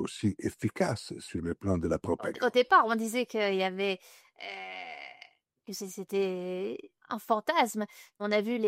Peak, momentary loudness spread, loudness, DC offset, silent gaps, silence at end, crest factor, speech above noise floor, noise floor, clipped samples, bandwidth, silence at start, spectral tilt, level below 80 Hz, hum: -10 dBFS; 14 LU; -31 LUFS; under 0.1%; none; 0 s; 20 dB; 27 dB; -58 dBFS; under 0.1%; 16 kHz; 0 s; -5 dB/octave; -60 dBFS; none